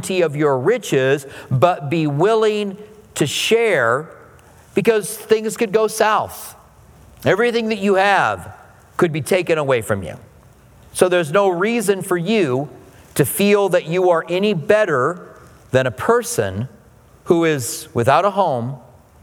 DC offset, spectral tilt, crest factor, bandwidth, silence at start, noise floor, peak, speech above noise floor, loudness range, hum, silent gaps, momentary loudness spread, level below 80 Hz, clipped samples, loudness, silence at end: under 0.1%; -5 dB/octave; 18 dB; 19 kHz; 0 s; -48 dBFS; 0 dBFS; 31 dB; 2 LU; none; none; 13 LU; -56 dBFS; under 0.1%; -18 LUFS; 0.45 s